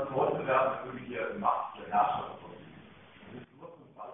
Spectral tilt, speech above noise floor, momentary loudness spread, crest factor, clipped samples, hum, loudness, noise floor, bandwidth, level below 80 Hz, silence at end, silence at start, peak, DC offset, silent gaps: -9 dB/octave; 23 dB; 23 LU; 18 dB; under 0.1%; none; -31 LUFS; -54 dBFS; 3.8 kHz; -68 dBFS; 0 s; 0 s; -14 dBFS; under 0.1%; none